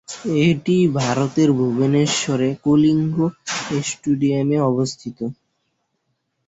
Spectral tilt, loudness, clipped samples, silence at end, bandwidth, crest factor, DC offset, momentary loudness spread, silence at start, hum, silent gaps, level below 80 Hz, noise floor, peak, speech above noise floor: -5.5 dB/octave; -19 LUFS; under 0.1%; 1.15 s; 8.2 kHz; 14 dB; under 0.1%; 8 LU; 0.1 s; none; none; -56 dBFS; -72 dBFS; -6 dBFS; 54 dB